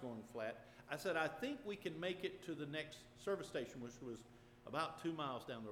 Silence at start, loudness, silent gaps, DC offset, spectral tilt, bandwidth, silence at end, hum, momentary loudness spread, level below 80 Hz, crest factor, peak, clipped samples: 0 s; -46 LUFS; none; under 0.1%; -5 dB/octave; 19 kHz; 0 s; none; 11 LU; -74 dBFS; 20 dB; -26 dBFS; under 0.1%